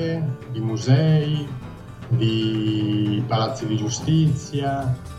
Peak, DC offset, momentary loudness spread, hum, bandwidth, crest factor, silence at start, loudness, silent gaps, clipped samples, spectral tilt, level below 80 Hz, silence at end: -6 dBFS; under 0.1%; 9 LU; none; 10 kHz; 16 dB; 0 s; -22 LUFS; none; under 0.1%; -6.5 dB/octave; -48 dBFS; 0 s